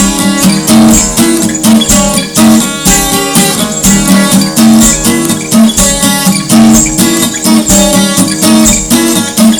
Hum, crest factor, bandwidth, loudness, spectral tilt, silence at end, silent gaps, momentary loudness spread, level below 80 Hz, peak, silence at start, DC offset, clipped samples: none; 6 dB; over 20 kHz; -6 LUFS; -3.5 dB/octave; 0 s; none; 4 LU; -24 dBFS; 0 dBFS; 0 s; under 0.1%; 4%